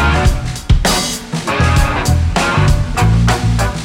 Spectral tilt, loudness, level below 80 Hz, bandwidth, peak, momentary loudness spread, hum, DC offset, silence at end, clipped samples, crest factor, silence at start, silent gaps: -5 dB/octave; -14 LUFS; -18 dBFS; 17 kHz; 0 dBFS; 5 LU; none; under 0.1%; 0 s; under 0.1%; 12 dB; 0 s; none